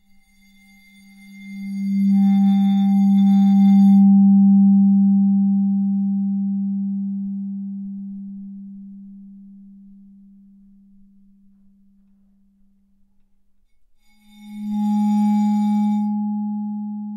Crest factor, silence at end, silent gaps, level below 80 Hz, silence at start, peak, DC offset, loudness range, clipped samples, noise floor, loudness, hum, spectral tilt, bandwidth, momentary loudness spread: 12 dB; 0 s; none; -66 dBFS; 1.3 s; -8 dBFS; under 0.1%; 19 LU; under 0.1%; -57 dBFS; -17 LUFS; none; -9 dB/octave; 4.9 kHz; 21 LU